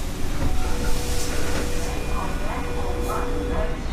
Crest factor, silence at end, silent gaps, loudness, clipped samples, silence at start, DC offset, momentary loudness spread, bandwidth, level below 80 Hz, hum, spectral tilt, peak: 12 dB; 0 s; none; -27 LUFS; under 0.1%; 0 s; under 0.1%; 2 LU; 15.5 kHz; -26 dBFS; none; -4.5 dB/octave; -10 dBFS